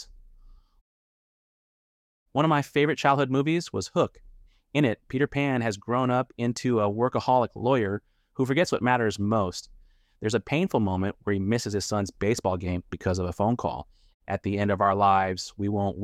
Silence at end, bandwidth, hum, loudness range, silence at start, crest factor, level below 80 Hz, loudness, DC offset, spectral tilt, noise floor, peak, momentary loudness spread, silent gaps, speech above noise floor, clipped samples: 0 s; 15 kHz; none; 2 LU; 0 s; 18 dB; -54 dBFS; -26 LUFS; under 0.1%; -6 dB/octave; -53 dBFS; -8 dBFS; 8 LU; 0.81-2.26 s, 14.14-14.20 s; 27 dB; under 0.1%